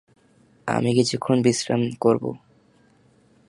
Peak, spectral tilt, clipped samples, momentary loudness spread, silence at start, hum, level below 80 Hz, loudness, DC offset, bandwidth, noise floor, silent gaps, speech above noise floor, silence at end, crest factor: -4 dBFS; -5.5 dB/octave; under 0.1%; 13 LU; 0.65 s; none; -64 dBFS; -22 LUFS; under 0.1%; 11.5 kHz; -58 dBFS; none; 37 dB; 1.1 s; 18 dB